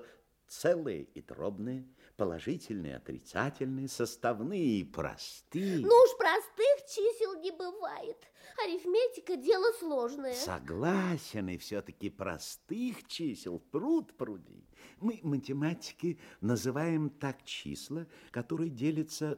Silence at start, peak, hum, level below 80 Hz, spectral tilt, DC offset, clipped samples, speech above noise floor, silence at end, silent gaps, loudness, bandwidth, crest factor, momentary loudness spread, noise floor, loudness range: 0 s; -12 dBFS; none; -68 dBFS; -5.5 dB/octave; under 0.1%; under 0.1%; 26 dB; 0 s; none; -33 LUFS; 16.5 kHz; 22 dB; 13 LU; -59 dBFS; 9 LU